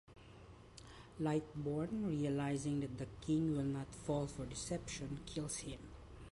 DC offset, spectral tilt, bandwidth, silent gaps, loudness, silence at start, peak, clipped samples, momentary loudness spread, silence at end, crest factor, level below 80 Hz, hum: under 0.1%; -6 dB/octave; 11.5 kHz; none; -41 LUFS; 0.1 s; -26 dBFS; under 0.1%; 19 LU; 0.05 s; 16 dB; -60 dBFS; none